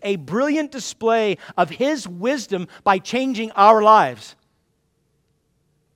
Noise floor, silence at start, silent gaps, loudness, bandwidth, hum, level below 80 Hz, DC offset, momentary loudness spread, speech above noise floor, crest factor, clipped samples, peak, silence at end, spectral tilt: -67 dBFS; 0 s; none; -19 LUFS; 15.5 kHz; none; -66 dBFS; under 0.1%; 11 LU; 49 dB; 20 dB; under 0.1%; 0 dBFS; 1.65 s; -4.5 dB/octave